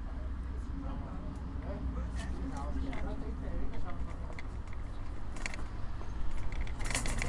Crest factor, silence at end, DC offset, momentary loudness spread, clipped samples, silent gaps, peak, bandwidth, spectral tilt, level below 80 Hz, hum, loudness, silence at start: 20 dB; 0 s; under 0.1%; 5 LU; under 0.1%; none; -14 dBFS; 11.5 kHz; -5 dB/octave; -38 dBFS; none; -41 LUFS; 0 s